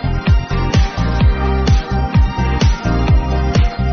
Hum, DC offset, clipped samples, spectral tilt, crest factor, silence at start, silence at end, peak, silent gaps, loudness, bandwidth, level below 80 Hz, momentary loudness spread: none; 0.8%; under 0.1%; -6 dB/octave; 10 dB; 0 s; 0 s; -2 dBFS; none; -16 LUFS; 6.8 kHz; -16 dBFS; 2 LU